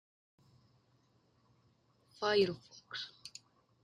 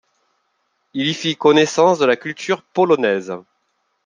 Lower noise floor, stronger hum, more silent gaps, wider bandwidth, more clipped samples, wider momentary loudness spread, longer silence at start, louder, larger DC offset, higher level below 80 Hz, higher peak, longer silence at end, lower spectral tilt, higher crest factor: about the same, -72 dBFS vs -69 dBFS; neither; neither; about the same, 10 kHz vs 9.6 kHz; neither; first, 21 LU vs 12 LU; first, 2.2 s vs 0.95 s; second, -36 LUFS vs -17 LUFS; neither; second, -78 dBFS vs -68 dBFS; second, -18 dBFS vs -2 dBFS; about the same, 0.55 s vs 0.65 s; about the same, -4.5 dB/octave vs -4.5 dB/octave; first, 24 dB vs 18 dB